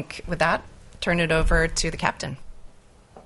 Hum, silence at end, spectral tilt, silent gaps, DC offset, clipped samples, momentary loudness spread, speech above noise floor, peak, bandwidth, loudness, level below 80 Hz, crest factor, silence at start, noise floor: none; 0.05 s; -4 dB/octave; none; under 0.1%; under 0.1%; 13 LU; 27 dB; -4 dBFS; 11.5 kHz; -24 LUFS; -32 dBFS; 22 dB; 0 s; -50 dBFS